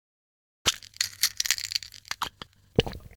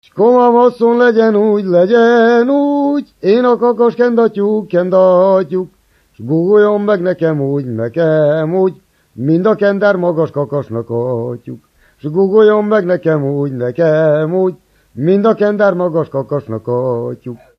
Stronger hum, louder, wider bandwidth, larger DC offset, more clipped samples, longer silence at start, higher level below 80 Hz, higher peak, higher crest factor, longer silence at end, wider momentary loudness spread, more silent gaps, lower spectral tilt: neither; second, -28 LUFS vs -12 LUFS; first, over 20 kHz vs 6.4 kHz; neither; neither; first, 0.65 s vs 0.15 s; first, -48 dBFS vs -58 dBFS; second, -4 dBFS vs 0 dBFS; first, 28 dB vs 12 dB; second, 0.1 s vs 0.25 s; about the same, 9 LU vs 10 LU; neither; second, -2 dB/octave vs -9 dB/octave